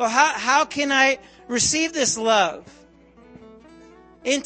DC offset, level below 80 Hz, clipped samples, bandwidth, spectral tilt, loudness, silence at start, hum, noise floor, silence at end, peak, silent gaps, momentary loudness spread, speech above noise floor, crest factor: under 0.1%; -56 dBFS; under 0.1%; 8.8 kHz; -1.5 dB/octave; -20 LUFS; 0 s; none; -50 dBFS; 0 s; -2 dBFS; none; 11 LU; 30 dB; 20 dB